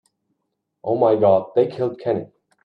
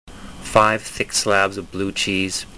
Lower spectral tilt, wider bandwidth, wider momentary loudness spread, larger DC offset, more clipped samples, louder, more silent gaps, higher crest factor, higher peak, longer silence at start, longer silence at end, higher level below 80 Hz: first, -9.5 dB/octave vs -3 dB/octave; second, 5.2 kHz vs 11 kHz; about the same, 10 LU vs 10 LU; second, under 0.1% vs 0.5%; neither; about the same, -19 LUFS vs -19 LUFS; neither; about the same, 16 dB vs 20 dB; about the same, -4 dBFS vs -2 dBFS; first, 0.85 s vs 0.05 s; first, 0.4 s vs 0 s; second, -68 dBFS vs -44 dBFS